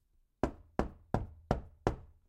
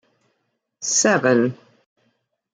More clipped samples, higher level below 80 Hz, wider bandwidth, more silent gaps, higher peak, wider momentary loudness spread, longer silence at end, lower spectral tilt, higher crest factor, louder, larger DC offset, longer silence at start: neither; first, -46 dBFS vs -74 dBFS; about the same, 11 kHz vs 10 kHz; neither; second, -10 dBFS vs -4 dBFS; second, 3 LU vs 9 LU; second, 0.25 s vs 1 s; first, -7.5 dB/octave vs -3 dB/octave; first, 28 dB vs 18 dB; second, -39 LUFS vs -18 LUFS; neither; second, 0.45 s vs 0.8 s